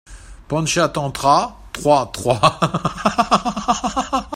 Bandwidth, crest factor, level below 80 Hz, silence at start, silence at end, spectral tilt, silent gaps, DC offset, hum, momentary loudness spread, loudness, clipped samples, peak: 16 kHz; 18 dB; -42 dBFS; 0.1 s; 0 s; -4.5 dB/octave; none; under 0.1%; none; 6 LU; -18 LUFS; under 0.1%; 0 dBFS